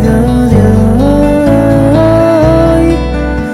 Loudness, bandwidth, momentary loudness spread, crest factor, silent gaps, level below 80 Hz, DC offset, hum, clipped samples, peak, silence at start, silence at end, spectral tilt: -8 LUFS; 14 kHz; 4 LU; 6 dB; none; -18 dBFS; under 0.1%; none; 0.4%; 0 dBFS; 0 s; 0 s; -8 dB/octave